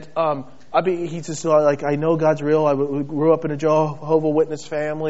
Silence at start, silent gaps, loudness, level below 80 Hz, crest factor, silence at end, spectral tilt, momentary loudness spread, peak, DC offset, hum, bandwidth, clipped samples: 0 s; none; -20 LUFS; -62 dBFS; 16 dB; 0 s; -6.5 dB/octave; 8 LU; -4 dBFS; 1%; none; 8 kHz; under 0.1%